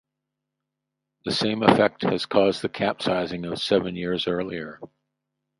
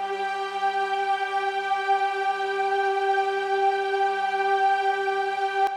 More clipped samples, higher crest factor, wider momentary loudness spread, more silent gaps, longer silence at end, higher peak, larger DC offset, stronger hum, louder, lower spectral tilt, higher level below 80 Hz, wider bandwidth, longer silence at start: neither; first, 26 dB vs 12 dB; first, 11 LU vs 4 LU; neither; first, 0.75 s vs 0 s; first, 0 dBFS vs -12 dBFS; neither; neither; about the same, -23 LUFS vs -25 LUFS; first, -5.5 dB/octave vs -2 dB/octave; first, -58 dBFS vs -74 dBFS; about the same, 11.5 kHz vs 11.5 kHz; first, 1.25 s vs 0 s